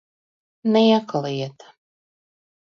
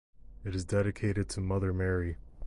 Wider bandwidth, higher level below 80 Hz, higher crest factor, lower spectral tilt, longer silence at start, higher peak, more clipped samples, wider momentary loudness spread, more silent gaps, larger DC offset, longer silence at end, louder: second, 6.8 kHz vs 11.5 kHz; second, -72 dBFS vs -44 dBFS; about the same, 18 dB vs 14 dB; about the same, -6.5 dB/octave vs -6.5 dB/octave; first, 0.65 s vs 0.2 s; first, -6 dBFS vs -18 dBFS; neither; first, 13 LU vs 8 LU; neither; neither; first, 1.2 s vs 0 s; first, -20 LUFS vs -33 LUFS